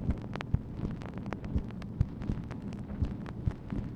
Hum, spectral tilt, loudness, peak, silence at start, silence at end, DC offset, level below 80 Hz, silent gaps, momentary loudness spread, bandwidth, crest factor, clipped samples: none; -8.5 dB/octave; -37 LUFS; -14 dBFS; 0 s; 0 s; under 0.1%; -40 dBFS; none; 5 LU; 8.8 kHz; 22 dB; under 0.1%